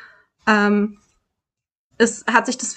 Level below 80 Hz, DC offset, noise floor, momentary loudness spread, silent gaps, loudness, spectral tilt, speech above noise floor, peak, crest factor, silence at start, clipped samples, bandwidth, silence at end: -64 dBFS; under 0.1%; -83 dBFS; 7 LU; 1.72-1.90 s; -19 LUFS; -4 dB/octave; 65 dB; -2 dBFS; 20 dB; 0.45 s; under 0.1%; 9.4 kHz; 0 s